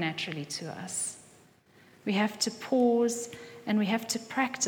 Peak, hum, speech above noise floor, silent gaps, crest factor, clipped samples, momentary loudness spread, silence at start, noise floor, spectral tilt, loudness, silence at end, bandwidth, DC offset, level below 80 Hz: -14 dBFS; none; 30 dB; none; 16 dB; under 0.1%; 12 LU; 0 s; -60 dBFS; -3.5 dB/octave; -30 LUFS; 0 s; 19 kHz; under 0.1%; -78 dBFS